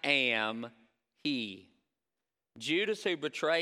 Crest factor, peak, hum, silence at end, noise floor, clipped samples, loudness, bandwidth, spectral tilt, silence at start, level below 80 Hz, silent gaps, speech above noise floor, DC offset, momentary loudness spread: 22 dB; -12 dBFS; none; 0 s; under -90 dBFS; under 0.1%; -32 LUFS; 15 kHz; -3.5 dB/octave; 0.05 s; -86 dBFS; none; over 58 dB; under 0.1%; 15 LU